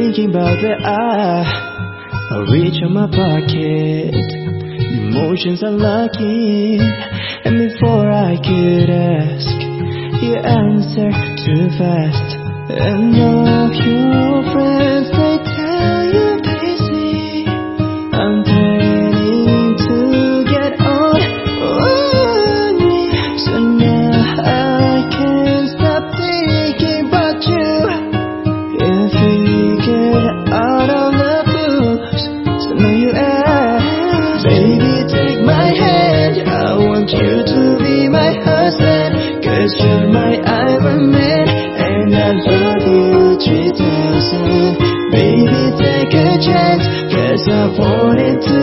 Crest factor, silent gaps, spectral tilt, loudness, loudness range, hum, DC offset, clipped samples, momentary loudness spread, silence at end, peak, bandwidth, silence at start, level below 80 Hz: 12 dB; none; -10 dB/octave; -13 LUFS; 4 LU; none; under 0.1%; under 0.1%; 6 LU; 0 s; 0 dBFS; 6 kHz; 0 s; -36 dBFS